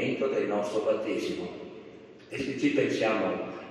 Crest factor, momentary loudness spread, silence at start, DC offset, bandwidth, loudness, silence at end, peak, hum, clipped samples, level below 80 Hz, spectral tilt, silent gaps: 18 dB; 18 LU; 0 s; under 0.1%; 12.5 kHz; -29 LUFS; 0 s; -12 dBFS; none; under 0.1%; -70 dBFS; -5.5 dB/octave; none